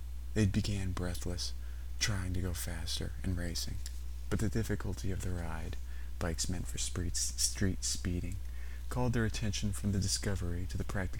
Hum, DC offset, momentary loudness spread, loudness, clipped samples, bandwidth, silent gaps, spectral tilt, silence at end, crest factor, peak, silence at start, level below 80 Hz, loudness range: none; 0.8%; 11 LU; -36 LUFS; under 0.1%; 18 kHz; none; -4 dB/octave; 0 s; 20 dB; -16 dBFS; 0 s; -40 dBFS; 3 LU